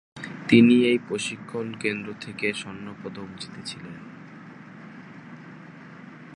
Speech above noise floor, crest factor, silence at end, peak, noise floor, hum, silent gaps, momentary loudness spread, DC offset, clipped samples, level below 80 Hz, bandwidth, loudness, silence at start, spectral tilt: 20 dB; 24 dB; 0 s; -2 dBFS; -44 dBFS; none; none; 27 LU; under 0.1%; under 0.1%; -66 dBFS; 11 kHz; -23 LUFS; 0.15 s; -5.5 dB/octave